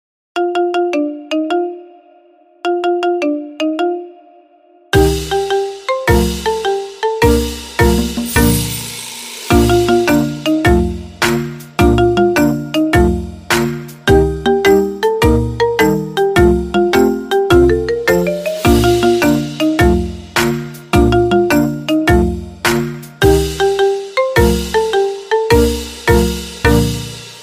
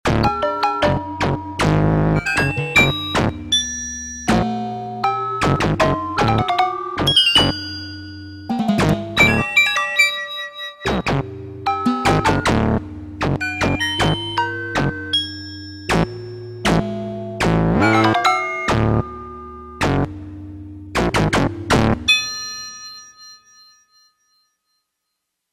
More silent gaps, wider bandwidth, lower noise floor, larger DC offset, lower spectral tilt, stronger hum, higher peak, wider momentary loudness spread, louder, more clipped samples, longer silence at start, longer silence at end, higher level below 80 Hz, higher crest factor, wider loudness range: neither; about the same, 16 kHz vs 15.5 kHz; second, -48 dBFS vs -77 dBFS; neither; about the same, -5.5 dB/octave vs -4.5 dB/octave; neither; about the same, 0 dBFS vs 0 dBFS; second, 8 LU vs 16 LU; first, -14 LUFS vs -18 LUFS; neither; first, 0.35 s vs 0.05 s; second, 0 s vs 2.15 s; first, -24 dBFS vs -34 dBFS; second, 14 dB vs 20 dB; about the same, 5 LU vs 4 LU